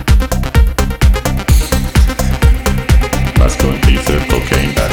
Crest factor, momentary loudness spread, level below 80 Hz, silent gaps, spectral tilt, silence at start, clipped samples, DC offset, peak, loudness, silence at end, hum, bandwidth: 10 dB; 2 LU; -12 dBFS; none; -5.5 dB/octave; 0 s; under 0.1%; under 0.1%; 0 dBFS; -13 LUFS; 0 s; none; 19.5 kHz